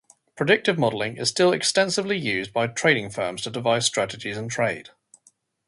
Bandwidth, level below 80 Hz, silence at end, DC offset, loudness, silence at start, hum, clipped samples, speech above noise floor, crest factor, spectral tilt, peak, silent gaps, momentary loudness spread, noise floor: 11.5 kHz; -62 dBFS; 0.85 s; under 0.1%; -23 LUFS; 0.35 s; none; under 0.1%; 39 dB; 20 dB; -3.5 dB/octave; -4 dBFS; none; 8 LU; -62 dBFS